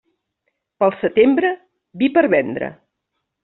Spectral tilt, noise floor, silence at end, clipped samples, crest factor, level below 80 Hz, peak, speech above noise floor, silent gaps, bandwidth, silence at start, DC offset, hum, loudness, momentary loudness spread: -4 dB/octave; -76 dBFS; 0.7 s; under 0.1%; 16 dB; -60 dBFS; -2 dBFS; 60 dB; none; 4.1 kHz; 0.8 s; under 0.1%; none; -17 LUFS; 13 LU